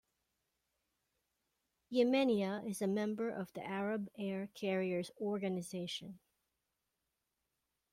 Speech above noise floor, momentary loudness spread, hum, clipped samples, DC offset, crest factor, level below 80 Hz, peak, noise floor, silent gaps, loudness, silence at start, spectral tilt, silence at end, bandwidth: 50 dB; 10 LU; none; under 0.1%; under 0.1%; 20 dB; -80 dBFS; -20 dBFS; -87 dBFS; none; -38 LUFS; 1.9 s; -5.5 dB/octave; 1.75 s; 15.5 kHz